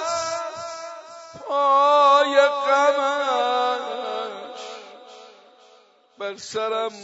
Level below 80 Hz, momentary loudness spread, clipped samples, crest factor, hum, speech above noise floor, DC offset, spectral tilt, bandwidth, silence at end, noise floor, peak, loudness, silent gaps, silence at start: -74 dBFS; 21 LU; under 0.1%; 20 dB; none; 35 dB; under 0.1%; -1.5 dB/octave; 8 kHz; 0 s; -55 dBFS; -2 dBFS; -20 LUFS; none; 0 s